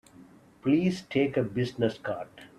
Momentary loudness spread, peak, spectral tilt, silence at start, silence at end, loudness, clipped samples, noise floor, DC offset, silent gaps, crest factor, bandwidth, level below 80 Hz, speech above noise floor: 10 LU; -12 dBFS; -7 dB/octave; 0.2 s; 0.15 s; -29 LUFS; under 0.1%; -54 dBFS; under 0.1%; none; 18 dB; 12 kHz; -64 dBFS; 26 dB